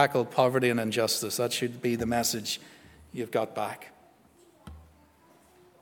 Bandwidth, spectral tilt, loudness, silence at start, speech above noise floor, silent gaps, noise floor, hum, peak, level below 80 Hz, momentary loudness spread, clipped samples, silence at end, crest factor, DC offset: over 20 kHz; -3.5 dB/octave; -28 LUFS; 0 s; 31 dB; none; -60 dBFS; none; -6 dBFS; -60 dBFS; 15 LU; under 0.1%; 1 s; 24 dB; under 0.1%